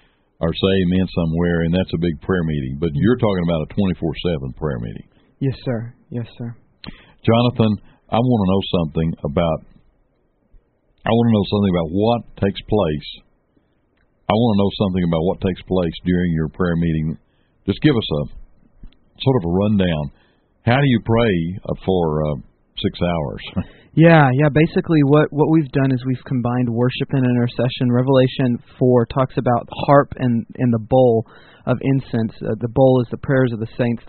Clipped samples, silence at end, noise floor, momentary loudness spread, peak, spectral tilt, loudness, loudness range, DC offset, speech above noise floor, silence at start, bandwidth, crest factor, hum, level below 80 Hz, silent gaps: under 0.1%; 0 s; -62 dBFS; 12 LU; 0 dBFS; -6.5 dB/octave; -19 LUFS; 5 LU; under 0.1%; 44 dB; 0.4 s; 4.5 kHz; 18 dB; none; -40 dBFS; none